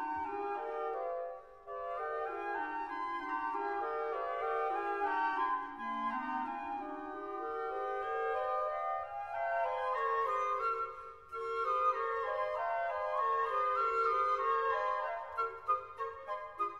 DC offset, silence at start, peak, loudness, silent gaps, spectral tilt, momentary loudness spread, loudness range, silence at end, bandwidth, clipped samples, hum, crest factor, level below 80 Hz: under 0.1%; 0 s; -22 dBFS; -36 LUFS; none; -4.5 dB/octave; 10 LU; 5 LU; 0 s; 11.5 kHz; under 0.1%; none; 14 dB; -70 dBFS